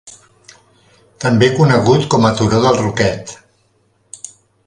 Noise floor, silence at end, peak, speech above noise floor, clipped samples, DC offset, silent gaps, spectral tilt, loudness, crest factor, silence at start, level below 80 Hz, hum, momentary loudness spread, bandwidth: -58 dBFS; 0.4 s; 0 dBFS; 46 dB; under 0.1%; under 0.1%; none; -6 dB/octave; -13 LUFS; 16 dB; 0.05 s; -44 dBFS; none; 21 LU; 11 kHz